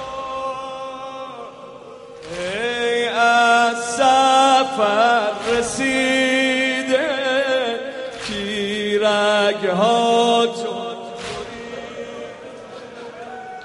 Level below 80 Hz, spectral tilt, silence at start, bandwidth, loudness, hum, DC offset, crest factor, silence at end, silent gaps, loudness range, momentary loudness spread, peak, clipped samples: -56 dBFS; -3 dB/octave; 0 s; 11.5 kHz; -18 LUFS; none; under 0.1%; 16 dB; 0 s; none; 7 LU; 20 LU; -4 dBFS; under 0.1%